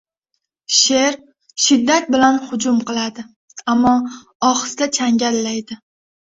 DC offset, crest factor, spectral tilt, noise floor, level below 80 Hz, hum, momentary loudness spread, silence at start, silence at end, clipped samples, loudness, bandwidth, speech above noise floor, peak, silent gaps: under 0.1%; 18 dB; -2 dB/octave; -75 dBFS; -56 dBFS; none; 18 LU; 0.7 s; 0.65 s; under 0.1%; -16 LUFS; 8 kHz; 58 dB; 0 dBFS; 3.36-3.48 s, 4.35-4.40 s